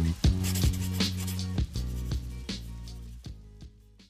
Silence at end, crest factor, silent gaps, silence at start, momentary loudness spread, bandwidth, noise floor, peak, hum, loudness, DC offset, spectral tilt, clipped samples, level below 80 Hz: 0.05 s; 16 dB; none; 0 s; 19 LU; 16 kHz; -51 dBFS; -16 dBFS; none; -31 LUFS; under 0.1%; -5 dB/octave; under 0.1%; -36 dBFS